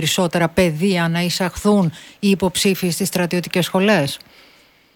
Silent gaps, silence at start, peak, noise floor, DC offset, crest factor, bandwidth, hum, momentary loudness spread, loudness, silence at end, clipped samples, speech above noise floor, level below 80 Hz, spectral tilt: none; 0 s; -2 dBFS; -52 dBFS; under 0.1%; 16 dB; 18.5 kHz; none; 4 LU; -18 LUFS; 0.8 s; under 0.1%; 34 dB; -46 dBFS; -4.5 dB/octave